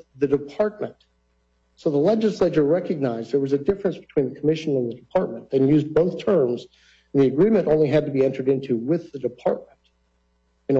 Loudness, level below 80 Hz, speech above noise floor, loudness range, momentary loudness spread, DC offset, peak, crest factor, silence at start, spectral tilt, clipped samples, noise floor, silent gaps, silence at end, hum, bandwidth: -22 LUFS; -54 dBFS; 45 dB; 3 LU; 7 LU; under 0.1%; -8 dBFS; 14 dB; 0.15 s; -8.5 dB/octave; under 0.1%; -66 dBFS; none; 0 s; none; 7.6 kHz